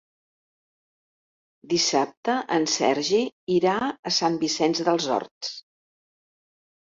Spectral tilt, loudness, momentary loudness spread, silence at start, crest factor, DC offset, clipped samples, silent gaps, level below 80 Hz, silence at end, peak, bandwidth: -3 dB/octave; -24 LUFS; 6 LU; 1.65 s; 18 dB; under 0.1%; under 0.1%; 2.17-2.23 s, 3.32-3.47 s, 3.99-4.03 s, 5.31-5.41 s; -68 dBFS; 1.25 s; -8 dBFS; 7.8 kHz